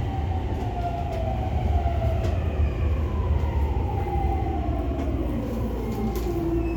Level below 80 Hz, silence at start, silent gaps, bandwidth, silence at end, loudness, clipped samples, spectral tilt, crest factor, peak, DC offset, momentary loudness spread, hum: -28 dBFS; 0 s; none; 17.5 kHz; 0 s; -27 LUFS; under 0.1%; -8.5 dB/octave; 14 dB; -12 dBFS; under 0.1%; 3 LU; none